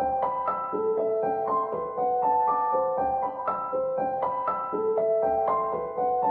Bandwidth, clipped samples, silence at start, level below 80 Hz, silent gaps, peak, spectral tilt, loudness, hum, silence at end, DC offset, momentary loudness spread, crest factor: 4.2 kHz; under 0.1%; 0 s; -60 dBFS; none; -14 dBFS; -10 dB/octave; -27 LUFS; none; 0 s; under 0.1%; 4 LU; 12 dB